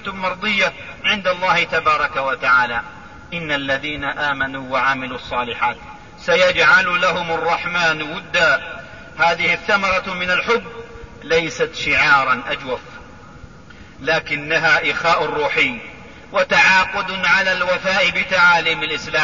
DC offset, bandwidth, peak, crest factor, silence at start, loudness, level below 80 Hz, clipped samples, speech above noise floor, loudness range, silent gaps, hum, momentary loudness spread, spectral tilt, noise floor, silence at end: 0.4%; 7.4 kHz; -2 dBFS; 18 dB; 0 s; -17 LUFS; -46 dBFS; under 0.1%; 23 dB; 4 LU; none; none; 12 LU; -3 dB/octave; -41 dBFS; 0 s